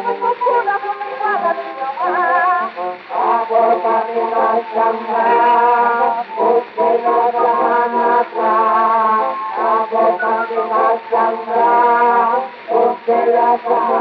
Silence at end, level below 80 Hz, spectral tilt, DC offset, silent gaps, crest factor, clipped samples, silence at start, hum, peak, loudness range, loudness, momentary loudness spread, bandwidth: 0 s; -82 dBFS; -7 dB/octave; under 0.1%; none; 12 dB; under 0.1%; 0 s; none; -4 dBFS; 2 LU; -15 LUFS; 7 LU; 5.6 kHz